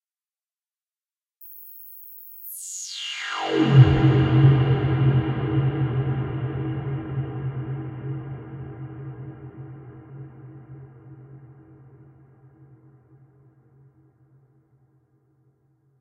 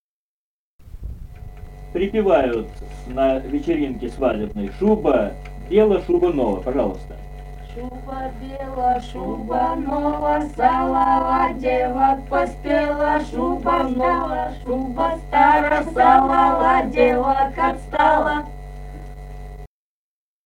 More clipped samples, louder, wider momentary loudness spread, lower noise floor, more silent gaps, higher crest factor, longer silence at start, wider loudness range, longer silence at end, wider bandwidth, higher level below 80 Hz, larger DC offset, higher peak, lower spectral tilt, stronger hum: neither; second, -22 LUFS vs -19 LUFS; first, 26 LU vs 21 LU; about the same, under -90 dBFS vs under -90 dBFS; neither; about the same, 22 dB vs 18 dB; first, 1.4 s vs 0.85 s; first, 22 LU vs 7 LU; first, 4.5 s vs 0.8 s; about the same, 16 kHz vs 16 kHz; second, -46 dBFS vs -36 dBFS; neither; about the same, -2 dBFS vs -2 dBFS; about the same, -7 dB/octave vs -7 dB/octave; neither